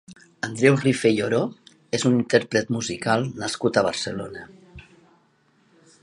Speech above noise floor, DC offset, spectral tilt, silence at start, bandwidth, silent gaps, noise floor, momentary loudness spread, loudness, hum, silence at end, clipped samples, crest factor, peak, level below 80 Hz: 40 dB; under 0.1%; -5 dB/octave; 0.1 s; 11.5 kHz; none; -62 dBFS; 13 LU; -23 LUFS; none; 1.25 s; under 0.1%; 22 dB; -2 dBFS; -58 dBFS